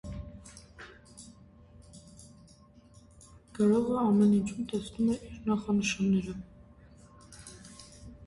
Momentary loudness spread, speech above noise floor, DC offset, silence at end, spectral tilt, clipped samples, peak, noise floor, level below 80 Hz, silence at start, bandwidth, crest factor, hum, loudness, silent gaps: 26 LU; 29 dB; under 0.1%; 0 s; -6 dB/octave; under 0.1%; -16 dBFS; -57 dBFS; -54 dBFS; 0.05 s; 11.5 kHz; 16 dB; none; -29 LUFS; none